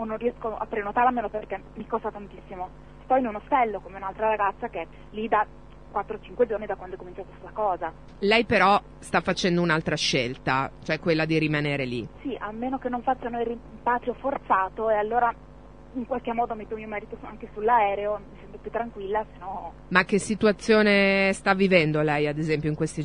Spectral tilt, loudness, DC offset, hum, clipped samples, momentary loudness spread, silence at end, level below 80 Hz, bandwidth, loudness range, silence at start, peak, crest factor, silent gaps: -5.5 dB/octave; -25 LUFS; 0.3%; none; under 0.1%; 16 LU; 0 s; -50 dBFS; 10 kHz; 7 LU; 0 s; -2 dBFS; 24 dB; none